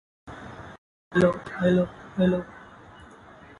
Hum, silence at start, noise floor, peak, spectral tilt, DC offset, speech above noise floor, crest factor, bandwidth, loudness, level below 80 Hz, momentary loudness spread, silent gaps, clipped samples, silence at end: none; 0.25 s; -49 dBFS; -8 dBFS; -8 dB/octave; under 0.1%; 26 dB; 20 dB; 11 kHz; -25 LUFS; -52 dBFS; 23 LU; 0.78-1.11 s; under 0.1%; 0.95 s